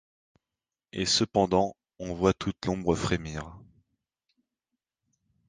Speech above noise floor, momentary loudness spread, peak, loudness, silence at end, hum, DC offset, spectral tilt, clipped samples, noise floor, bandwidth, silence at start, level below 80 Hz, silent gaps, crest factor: over 63 dB; 16 LU; -8 dBFS; -28 LUFS; 1.85 s; none; under 0.1%; -4.5 dB/octave; under 0.1%; under -90 dBFS; 10 kHz; 0.95 s; -50 dBFS; none; 22 dB